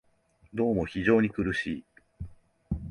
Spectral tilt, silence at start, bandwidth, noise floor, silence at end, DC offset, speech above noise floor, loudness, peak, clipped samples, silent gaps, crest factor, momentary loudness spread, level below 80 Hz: -7.5 dB/octave; 0.55 s; 10.5 kHz; -64 dBFS; 0 s; under 0.1%; 38 dB; -28 LUFS; -10 dBFS; under 0.1%; none; 20 dB; 21 LU; -48 dBFS